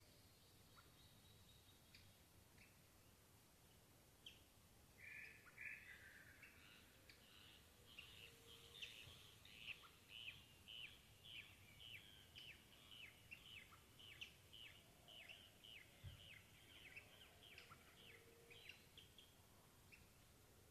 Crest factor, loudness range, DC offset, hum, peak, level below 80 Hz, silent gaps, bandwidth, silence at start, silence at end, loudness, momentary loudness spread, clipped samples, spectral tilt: 22 dB; 10 LU; under 0.1%; none; -42 dBFS; -80 dBFS; none; 14.5 kHz; 0 s; 0 s; -61 LUFS; 12 LU; under 0.1%; -2.5 dB/octave